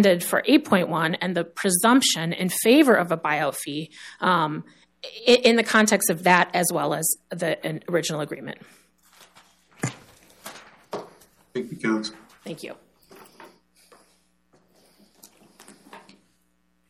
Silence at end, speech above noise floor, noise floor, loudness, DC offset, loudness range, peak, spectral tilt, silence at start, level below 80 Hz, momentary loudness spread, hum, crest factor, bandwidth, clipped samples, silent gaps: 0.9 s; 47 dB; -69 dBFS; -22 LUFS; under 0.1%; 14 LU; -4 dBFS; -3.5 dB/octave; 0 s; -70 dBFS; 21 LU; none; 20 dB; 16 kHz; under 0.1%; none